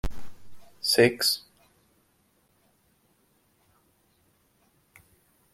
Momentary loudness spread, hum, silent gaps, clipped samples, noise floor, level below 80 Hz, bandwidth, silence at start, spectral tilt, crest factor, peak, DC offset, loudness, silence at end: 12 LU; none; none; under 0.1%; -68 dBFS; -48 dBFS; 16.5 kHz; 0.05 s; -3 dB/octave; 24 dB; -8 dBFS; under 0.1%; -24 LUFS; 4.15 s